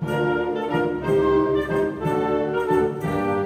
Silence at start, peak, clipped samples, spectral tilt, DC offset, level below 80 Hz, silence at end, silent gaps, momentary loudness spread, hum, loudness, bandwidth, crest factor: 0 s; -8 dBFS; under 0.1%; -7.5 dB/octave; under 0.1%; -44 dBFS; 0 s; none; 4 LU; none; -22 LUFS; 14.5 kHz; 12 dB